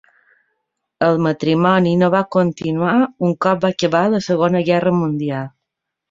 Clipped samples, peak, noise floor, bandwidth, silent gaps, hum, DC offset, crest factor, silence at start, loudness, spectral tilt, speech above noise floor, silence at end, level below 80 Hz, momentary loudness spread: under 0.1%; -2 dBFS; -79 dBFS; 7.6 kHz; none; none; under 0.1%; 16 dB; 1 s; -17 LUFS; -7 dB/octave; 63 dB; 0.6 s; -58 dBFS; 6 LU